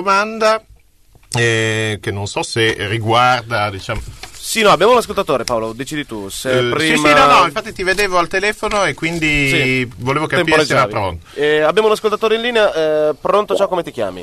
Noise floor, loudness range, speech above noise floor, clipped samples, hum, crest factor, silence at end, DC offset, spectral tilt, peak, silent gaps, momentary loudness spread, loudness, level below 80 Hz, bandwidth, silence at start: -48 dBFS; 3 LU; 33 dB; under 0.1%; none; 14 dB; 0 s; under 0.1%; -4 dB/octave; -2 dBFS; none; 11 LU; -15 LUFS; -40 dBFS; 13.5 kHz; 0 s